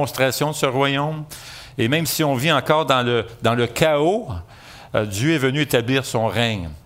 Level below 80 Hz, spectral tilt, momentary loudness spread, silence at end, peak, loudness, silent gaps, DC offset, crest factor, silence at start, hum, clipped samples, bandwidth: -50 dBFS; -4.5 dB/octave; 9 LU; 0.05 s; -2 dBFS; -20 LUFS; none; under 0.1%; 18 dB; 0 s; none; under 0.1%; 16 kHz